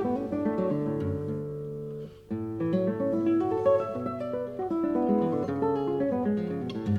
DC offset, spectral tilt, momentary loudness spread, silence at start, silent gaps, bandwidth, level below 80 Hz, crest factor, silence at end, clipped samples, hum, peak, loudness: under 0.1%; -9.5 dB/octave; 10 LU; 0 s; none; 7.2 kHz; -58 dBFS; 16 dB; 0 s; under 0.1%; none; -12 dBFS; -29 LUFS